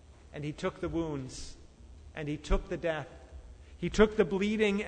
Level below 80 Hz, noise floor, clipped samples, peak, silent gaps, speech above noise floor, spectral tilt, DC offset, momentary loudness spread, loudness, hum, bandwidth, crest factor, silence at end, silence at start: -42 dBFS; -52 dBFS; under 0.1%; -10 dBFS; none; 21 dB; -6 dB/octave; under 0.1%; 21 LU; -32 LUFS; none; 9.6 kHz; 22 dB; 0 s; 0 s